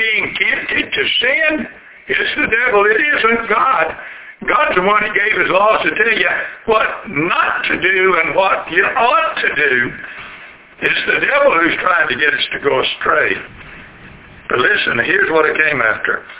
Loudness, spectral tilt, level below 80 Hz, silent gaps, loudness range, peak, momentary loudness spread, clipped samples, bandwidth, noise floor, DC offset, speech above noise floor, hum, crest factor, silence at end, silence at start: -13 LUFS; -7 dB/octave; -48 dBFS; none; 2 LU; 0 dBFS; 8 LU; under 0.1%; 4 kHz; -38 dBFS; under 0.1%; 24 dB; none; 14 dB; 0 s; 0 s